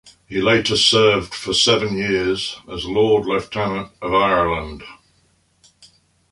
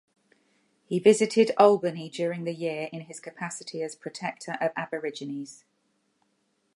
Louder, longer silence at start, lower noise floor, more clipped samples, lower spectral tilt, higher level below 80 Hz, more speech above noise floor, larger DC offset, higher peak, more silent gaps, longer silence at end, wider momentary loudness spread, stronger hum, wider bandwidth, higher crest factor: first, -18 LUFS vs -27 LUFS; second, 0.05 s vs 0.9 s; second, -60 dBFS vs -73 dBFS; neither; second, -3.5 dB/octave vs -5 dB/octave; first, -44 dBFS vs -82 dBFS; second, 42 dB vs 47 dB; neither; first, -2 dBFS vs -6 dBFS; neither; first, 1.4 s vs 1.2 s; second, 13 LU vs 16 LU; neither; about the same, 11.5 kHz vs 11.5 kHz; about the same, 18 dB vs 22 dB